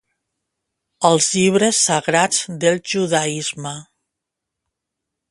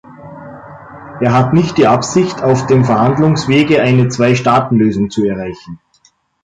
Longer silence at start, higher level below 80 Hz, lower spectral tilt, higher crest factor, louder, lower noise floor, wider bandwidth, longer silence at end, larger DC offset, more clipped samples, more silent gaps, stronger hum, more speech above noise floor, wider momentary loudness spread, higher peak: first, 1 s vs 0.1 s; second, -64 dBFS vs -44 dBFS; second, -3 dB/octave vs -6.5 dB/octave; first, 20 dB vs 12 dB; second, -17 LUFS vs -12 LUFS; first, -82 dBFS vs -54 dBFS; first, 11.5 kHz vs 9.2 kHz; first, 1.5 s vs 0.65 s; neither; neither; neither; neither; first, 64 dB vs 43 dB; second, 10 LU vs 21 LU; about the same, 0 dBFS vs -2 dBFS